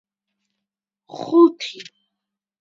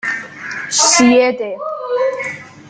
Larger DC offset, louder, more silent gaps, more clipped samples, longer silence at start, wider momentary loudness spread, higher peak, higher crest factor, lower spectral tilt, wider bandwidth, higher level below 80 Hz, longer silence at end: neither; about the same, -16 LUFS vs -14 LUFS; neither; neither; first, 1.15 s vs 0.05 s; first, 23 LU vs 16 LU; about the same, -2 dBFS vs 0 dBFS; about the same, 20 dB vs 16 dB; first, -5 dB/octave vs -1.5 dB/octave; second, 7.4 kHz vs 9.8 kHz; second, -78 dBFS vs -58 dBFS; first, 0.8 s vs 0 s